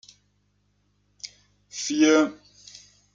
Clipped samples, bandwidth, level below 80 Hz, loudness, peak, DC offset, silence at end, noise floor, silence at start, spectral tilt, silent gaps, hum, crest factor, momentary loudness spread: under 0.1%; 7.6 kHz; -72 dBFS; -22 LUFS; -8 dBFS; under 0.1%; 0.8 s; -68 dBFS; 1.25 s; -2.5 dB/octave; none; 50 Hz at -60 dBFS; 20 dB; 27 LU